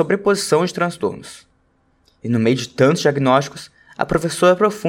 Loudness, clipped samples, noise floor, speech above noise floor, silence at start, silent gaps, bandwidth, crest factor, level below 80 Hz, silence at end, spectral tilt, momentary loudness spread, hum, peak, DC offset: -17 LUFS; under 0.1%; -61 dBFS; 43 dB; 0 s; none; 17 kHz; 18 dB; -50 dBFS; 0 s; -5.5 dB/octave; 18 LU; none; 0 dBFS; under 0.1%